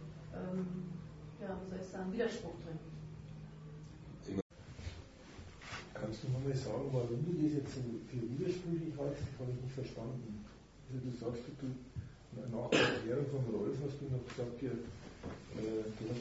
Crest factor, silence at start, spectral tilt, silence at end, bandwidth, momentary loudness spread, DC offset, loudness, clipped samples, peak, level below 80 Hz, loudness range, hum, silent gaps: 24 dB; 0 s; -5.5 dB/octave; 0 s; 7.6 kHz; 15 LU; under 0.1%; -41 LUFS; under 0.1%; -16 dBFS; -60 dBFS; 7 LU; none; 4.42-4.50 s